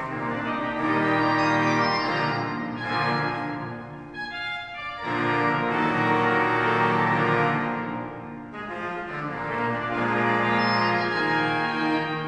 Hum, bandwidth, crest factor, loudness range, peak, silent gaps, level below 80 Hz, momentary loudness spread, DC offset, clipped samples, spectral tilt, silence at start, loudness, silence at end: none; 10.5 kHz; 16 dB; 4 LU; -10 dBFS; none; -58 dBFS; 12 LU; under 0.1%; under 0.1%; -6 dB/octave; 0 s; -24 LUFS; 0 s